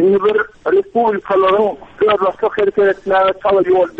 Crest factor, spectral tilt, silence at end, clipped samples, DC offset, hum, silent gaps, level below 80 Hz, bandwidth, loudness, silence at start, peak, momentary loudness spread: 10 dB; -7 dB/octave; 0.1 s; under 0.1%; under 0.1%; none; none; -50 dBFS; 4.7 kHz; -15 LUFS; 0 s; -4 dBFS; 4 LU